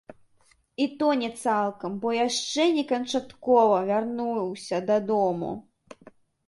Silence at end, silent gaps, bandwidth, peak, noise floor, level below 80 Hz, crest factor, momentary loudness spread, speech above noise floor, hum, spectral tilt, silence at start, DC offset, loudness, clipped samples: 0.85 s; none; 11.5 kHz; -8 dBFS; -63 dBFS; -68 dBFS; 18 dB; 9 LU; 38 dB; none; -4.5 dB/octave; 0.1 s; under 0.1%; -25 LUFS; under 0.1%